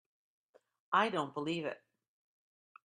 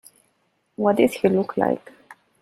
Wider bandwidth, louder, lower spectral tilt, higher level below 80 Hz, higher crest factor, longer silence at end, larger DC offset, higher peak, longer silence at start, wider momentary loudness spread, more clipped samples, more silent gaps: second, 10.5 kHz vs 15 kHz; second, -35 LUFS vs -21 LUFS; second, -5 dB/octave vs -6.5 dB/octave; second, -84 dBFS vs -62 dBFS; about the same, 24 dB vs 20 dB; first, 1.1 s vs 0.3 s; neither; second, -16 dBFS vs -4 dBFS; about the same, 0.9 s vs 0.8 s; first, 12 LU vs 9 LU; neither; neither